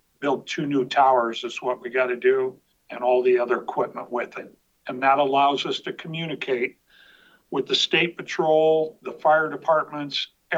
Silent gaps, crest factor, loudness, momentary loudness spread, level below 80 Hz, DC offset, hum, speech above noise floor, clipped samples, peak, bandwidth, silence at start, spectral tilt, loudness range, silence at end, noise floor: none; 16 dB; -23 LUFS; 11 LU; -74 dBFS; under 0.1%; none; 32 dB; under 0.1%; -6 dBFS; 8 kHz; 0.2 s; -4.5 dB/octave; 3 LU; 0 s; -55 dBFS